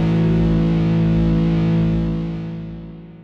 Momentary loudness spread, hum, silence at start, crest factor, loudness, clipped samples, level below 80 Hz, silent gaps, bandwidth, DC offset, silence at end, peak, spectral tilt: 14 LU; none; 0 s; 10 dB; -18 LUFS; under 0.1%; -30 dBFS; none; 5.4 kHz; under 0.1%; 0 s; -8 dBFS; -9.5 dB/octave